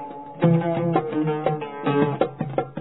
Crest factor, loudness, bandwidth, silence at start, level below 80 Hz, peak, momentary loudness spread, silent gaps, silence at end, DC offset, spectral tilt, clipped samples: 18 dB; -23 LUFS; 4.1 kHz; 0 s; -64 dBFS; -6 dBFS; 7 LU; none; 0 s; 0.2%; -12 dB/octave; under 0.1%